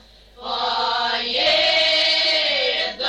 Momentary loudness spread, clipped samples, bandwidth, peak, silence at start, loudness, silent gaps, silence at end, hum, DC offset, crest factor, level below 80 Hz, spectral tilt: 8 LU; under 0.1%; 9.8 kHz; -8 dBFS; 0.4 s; -17 LUFS; none; 0 s; none; under 0.1%; 12 dB; -52 dBFS; -0.5 dB/octave